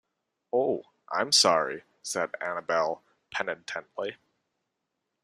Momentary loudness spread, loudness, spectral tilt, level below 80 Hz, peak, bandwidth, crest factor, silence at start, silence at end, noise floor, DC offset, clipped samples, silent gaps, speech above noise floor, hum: 16 LU; -28 LUFS; -1.5 dB/octave; -76 dBFS; -6 dBFS; 15 kHz; 24 dB; 0.55 s; 1.1 s; -83 dBFS; under 0.1%; under 0.1%; none; 55 dB; none